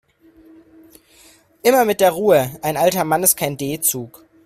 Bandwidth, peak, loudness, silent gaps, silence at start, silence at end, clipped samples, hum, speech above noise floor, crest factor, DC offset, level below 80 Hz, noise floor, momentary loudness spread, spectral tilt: 16 kHz; 0 dBFS; -17 LUFS; none; 1.65 s; 0.35 s; under 0.1%; none; 34 dB; 20 dB; under 0.1%; -56 dBFS; -50 dBFS; 8 LU; -3.5 dB/octave